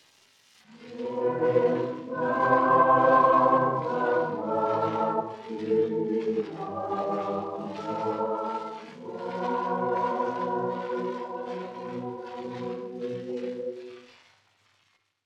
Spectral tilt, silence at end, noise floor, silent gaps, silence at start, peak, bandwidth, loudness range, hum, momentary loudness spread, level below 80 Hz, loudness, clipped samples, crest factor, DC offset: -7.5 dB/octave; 1.2 s; -70 dBFS; none; 0.7 s; -8 dBFS; 8 kHz; 12 LU; none; 16 LU; -88 dBFS; -27 LUFS; under 0.1%; 20 dB; under 0.1%